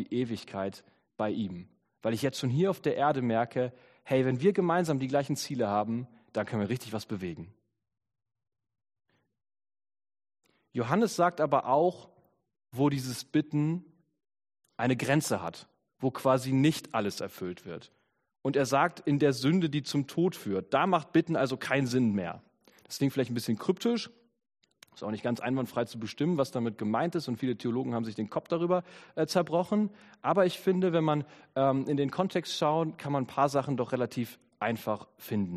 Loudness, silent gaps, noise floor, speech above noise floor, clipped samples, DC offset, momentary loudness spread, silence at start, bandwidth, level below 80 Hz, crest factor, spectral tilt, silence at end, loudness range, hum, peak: -30 LUFS; none; under -90 dBFS; over 61 dB; under 0.1%; under 0.1%; 11 LU; 0 s; 13.5 kHz; -70 dBFS; 20 dB; -6 dB/octave; 0 s; 5 LU; none; -10 dBFS